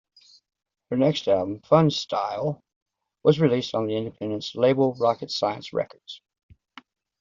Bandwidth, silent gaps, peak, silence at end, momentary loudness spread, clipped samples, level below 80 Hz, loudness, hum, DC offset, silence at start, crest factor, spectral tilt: 7.6 kHz; 2.76-2.86 s; -4 dBFS; 1.05 s; 11 LU; under 0.1%; -64 dBFS; -24 LUFS; none; under 0.1%; 0.9 s; 20 dB; -5.5 dB/octave